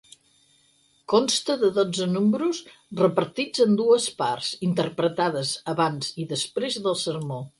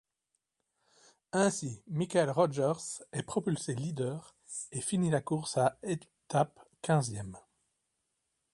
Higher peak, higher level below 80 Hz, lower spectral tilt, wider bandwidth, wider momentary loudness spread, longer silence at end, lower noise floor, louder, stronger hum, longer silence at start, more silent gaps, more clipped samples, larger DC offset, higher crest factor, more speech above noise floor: first, -6 dBFS vs -14 dBFS; about the same, -68 dBFS vs -68 dBFS; about the same, -4.5 dB/octave vs -5.5 dB/octave; about the same, 11.5 kHz vs 11.5 kHz; second, 7 LU vs 10 LU; second, 0.1 s vs 1.15 s; second, -63 dBFS vs -84 dBFS; first, -24 LUFS vs -33 LUFS; neither; second, 1.1 s vs 1.35 s; neither; neither; neither; about the same, 18 dB vs 20 dB; second, 39 dB vs 52 dB